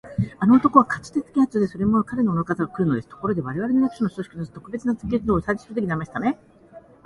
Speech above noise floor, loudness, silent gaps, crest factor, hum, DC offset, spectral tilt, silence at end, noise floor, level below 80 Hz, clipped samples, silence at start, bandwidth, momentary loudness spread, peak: 26 dB; -22 LUFS; none; 22 dB; none; under 0.1%; -8.5 dB/octave; 0.25 s; -48 dBFS; -48 dBFS; under 0.1%; 0.05 s; 11.5 kHz; 11 LU; 0 dBFS